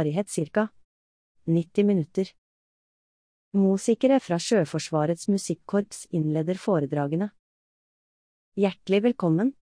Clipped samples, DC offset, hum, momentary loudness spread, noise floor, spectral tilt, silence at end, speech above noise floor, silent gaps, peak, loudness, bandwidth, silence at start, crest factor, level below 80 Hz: under 0.1%; under 0.1%; none; 7 LU; under -90 dBFS; -6.5 dB/octave; 0.2 s; over 66 dB; 0.84-1.35 s, 2.38-3.51 s, 7.39-8.52 s; -10 dBFS; -25 LUFS; 10.5 kHz; 0 s; 16 dB; -70 dBFS